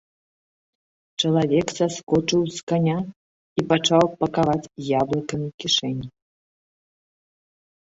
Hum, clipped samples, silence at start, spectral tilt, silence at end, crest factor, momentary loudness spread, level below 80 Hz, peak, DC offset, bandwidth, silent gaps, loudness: none; under 0.1%; 1.2 s; -5 dB/octave; 1.8 s; 22 dB; 11 LU; -56 dBFS; -2 dBFS; under 0.1%; 8 kHz; 2.03-2.07 s, 2.63-2.67 s, 3.16-3.56 s, 5.54-5.58 s; -22 LUFS